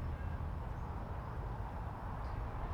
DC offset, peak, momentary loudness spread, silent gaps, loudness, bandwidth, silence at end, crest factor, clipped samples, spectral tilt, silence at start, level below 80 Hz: under 0.1%; -30 dBFS; 2 LU; none; -44 LUFS; 11.5 kHz; 0 s; 12 dB; under 0.1%; -8.5 dB/octave; 0 s; -44 dBFS